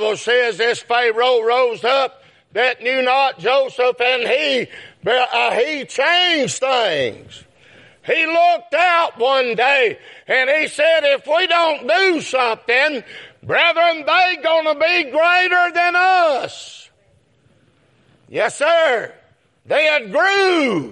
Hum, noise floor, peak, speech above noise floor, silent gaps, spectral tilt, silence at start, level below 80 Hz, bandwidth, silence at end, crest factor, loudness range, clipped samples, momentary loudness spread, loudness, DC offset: none; -57 dBFS; -2 dBFS; 41 dB; none; -2.5 dB/octave; 0 s; -70 dBFS; 11.5 kHz; 0 s; 16 dB; 4 LU; under 0.1%; 8 LU; -16 LUFS; under 0.1%